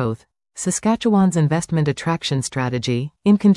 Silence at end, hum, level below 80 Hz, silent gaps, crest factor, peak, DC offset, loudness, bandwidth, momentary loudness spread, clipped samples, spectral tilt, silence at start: 0 s; none; -52 dBFS; none; 14 dB; -4 dBFS; under 0.1%; -20 LUFS; 12 kHz; 9 LU; under 0.1%; -6 dB/octave; 0 s